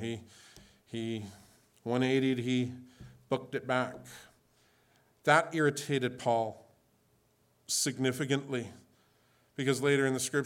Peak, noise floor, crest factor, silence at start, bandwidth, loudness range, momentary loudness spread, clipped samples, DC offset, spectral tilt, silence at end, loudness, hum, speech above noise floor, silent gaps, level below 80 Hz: -10 dBFS; -70 dBFS; 24 dB; 0 s; 17.5 kHz; 3 LU; 17 LU; under 0.1%; under 0.1%; -4.5 dB/octave; 0 s; -31 LUFS; none; 39 dB; none; -74 dBFS